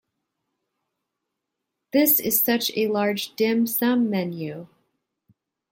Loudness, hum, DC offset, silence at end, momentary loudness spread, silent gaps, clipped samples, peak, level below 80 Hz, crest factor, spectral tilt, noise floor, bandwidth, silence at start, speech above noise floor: -21 LUFS; none; under 0.1%; 1.05 s; 13 LU; none; under 0.1%; -6 dBFS; -70 dBFS; 20 dB; -4 dB/octave; -82 dBFS; 17 kHz; 1.95 s; 60 dB